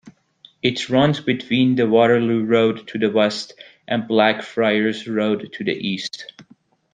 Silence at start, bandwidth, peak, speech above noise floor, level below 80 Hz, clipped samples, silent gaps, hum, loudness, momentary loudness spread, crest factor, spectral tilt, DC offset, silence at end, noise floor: 0.05 s; 9.4 kHz; -2 dBFS; 36 dB; -60 dBFS; under 0.1%; none; none; -19 LUFS; 10 LU; 18 dB; -6 dB/octave; under 0.1%; 0.5 s; -54 dBFS